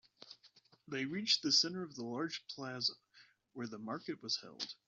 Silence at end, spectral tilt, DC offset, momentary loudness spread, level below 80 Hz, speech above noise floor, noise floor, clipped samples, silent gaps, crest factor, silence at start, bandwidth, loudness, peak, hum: 0.15 s; -2 dB/octave; under 0.1%; 25 LU; -86 dBFS; 29 dB; -68 dBFS; under 0.1%; none; 22 dB; 0.2 s; 7.4 kHz; -37 LUFS; -18 dBFS; none